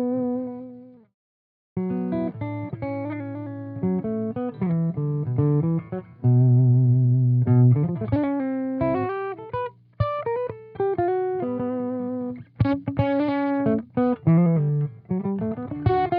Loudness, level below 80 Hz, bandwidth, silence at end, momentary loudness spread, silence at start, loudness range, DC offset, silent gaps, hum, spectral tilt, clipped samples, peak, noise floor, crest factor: -24 LUFS; -52 dBFS; 4.7 kHz; 0 s; 13 LU; 0 s; 9 LU; under 0.1%; 1.14-1.76 s; none; -9.5 dB/octave; under 0.1%; -8 dBFS; -43 dBFS; 14 dB